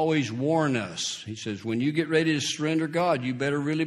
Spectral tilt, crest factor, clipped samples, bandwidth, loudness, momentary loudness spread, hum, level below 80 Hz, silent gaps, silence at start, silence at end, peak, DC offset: -5 dB/octave; 16 dB; under 0.1%; 12 kHz; -26 LUFS; 7 LU; none; -66 dBFS; none; 0 s; 0 s; -10 dBFS; under 0.1%